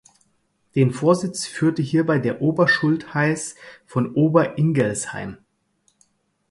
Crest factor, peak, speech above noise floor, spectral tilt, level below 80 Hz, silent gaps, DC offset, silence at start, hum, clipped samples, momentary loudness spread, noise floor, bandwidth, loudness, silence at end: 20 dB; -2 dBFS; 47 dB; -6 dB/octave; -60 dBFS; none; under 0.1%; 0.75 s; none; under 0.1%; 10 LU; -67 dBFS; 11.5 kHz; -20 LUFS; 1.15 s